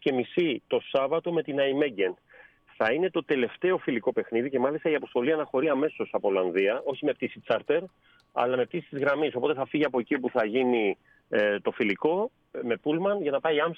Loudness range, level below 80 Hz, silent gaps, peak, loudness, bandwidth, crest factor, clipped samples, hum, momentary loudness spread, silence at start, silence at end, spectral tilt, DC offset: 1 LU; -74 dBFS; none; -10 dBFS; -27 LUFS; 5.6 kHz; 16 dB; under 0.1%; none; 5 LU; 0 s; 0 s; -7.5 dB/octave; under 0.1%